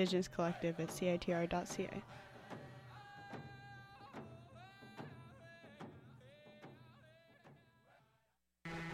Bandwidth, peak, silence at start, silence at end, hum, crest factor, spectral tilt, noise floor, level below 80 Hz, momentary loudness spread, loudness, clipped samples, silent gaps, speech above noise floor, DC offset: 15 kHz; -24 dBFS; 0 s; 0 s; none; 20 dB; -5.5 dB/octave; -82 dBFS; -68 dBFS; 23 LU; -43 LUFS; under 0.1%; none; 43 dB; under 0.1%